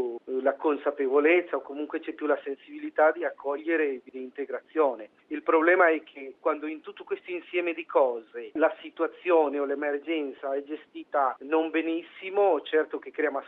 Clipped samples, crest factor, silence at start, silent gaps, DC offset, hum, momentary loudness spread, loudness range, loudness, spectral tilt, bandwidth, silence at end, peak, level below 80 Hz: under 0.1%; 18 dB; 0 s; none; under 0.1%; none; 14 LU; 3 LU; -27 LUFS; -6.5 dB/octave; 4 kHz; 0 s; -8 dBFS; -80 dBFS